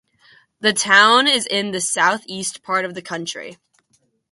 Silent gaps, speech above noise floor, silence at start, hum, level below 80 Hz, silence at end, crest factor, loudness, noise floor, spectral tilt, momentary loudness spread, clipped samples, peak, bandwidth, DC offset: none; 46 dB; 0.6 s; none; -68 dBFS; 0.8 s; 20 dB; -17 LUFS; -65 dBFS; -1.5 dB/octave; 16 LU; under 0.1%; 0 dBFS; 12 kHz; under 0.1%